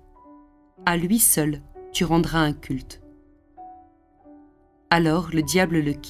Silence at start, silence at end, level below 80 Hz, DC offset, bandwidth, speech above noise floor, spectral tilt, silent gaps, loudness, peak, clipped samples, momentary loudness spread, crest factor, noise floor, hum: 0.8 s; 0 s; -44 dBFS; under 0.1%; 16 kHz; 34 dB; -4 dB/octave; none; -21 LUFS; -2 dBFS; under 0.1%; 15 LU; 22 dB; -56 dBFS; none